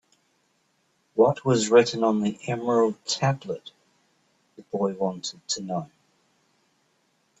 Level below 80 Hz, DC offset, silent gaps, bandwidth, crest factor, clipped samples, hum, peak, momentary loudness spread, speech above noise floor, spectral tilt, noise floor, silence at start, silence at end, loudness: -68 dBFS; under 0.1%; none; 8.4 kHz; 20 dB; under 0.1%; none; -6 dBFS; 15 LU; 45 dB; -5 dB/octave; -69 dBFS; 1.15 s; 1.55 s; -25 LUFS